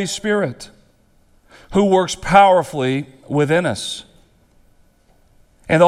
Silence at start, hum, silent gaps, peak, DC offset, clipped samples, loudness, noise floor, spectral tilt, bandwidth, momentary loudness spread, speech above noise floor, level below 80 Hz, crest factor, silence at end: 0 s; none; none; 0 dBFS; under 0.1%; under 0.1%; -17 LUFS; -55 dBFS; -5 dB/octave; 14 kHz; 18 LU; 38 dB; -46 dBFS; 18 dB; 0 s